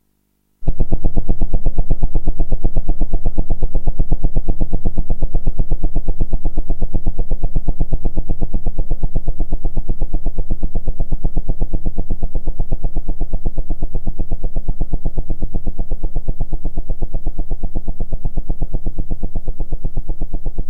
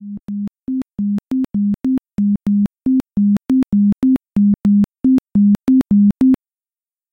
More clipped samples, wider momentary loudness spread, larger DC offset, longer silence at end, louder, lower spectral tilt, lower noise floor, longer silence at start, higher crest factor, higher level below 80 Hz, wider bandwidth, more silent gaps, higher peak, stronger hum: neither; second, 5 LU vs 10 LU; neither; second, 0 s vs 0.75 s; second, -26 LUFS vs -16 LUFS; about the same, -11 dB/octave vs -10 dB/octave; second, -63 dBFS vs under -90 dBFS; first, 0.6 s vs 0 s; about the same, 8 dB vs 10 dB; first, -16 dBFS vs -44 dBFS; second, 0.9 kHz vs 3.7 kHz; neither; first, 0 dBFS vs -6 dBFS; neither